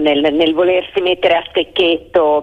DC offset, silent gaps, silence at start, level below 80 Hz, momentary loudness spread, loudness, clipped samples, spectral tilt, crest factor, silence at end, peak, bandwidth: under 0.1%; none; 0 s; -48 dBFS; 3 LU; -14 LUFS; under 0.1%; -6 dB/octave; 12 dB; 0 s; -2 dBFS; 6.2 kHz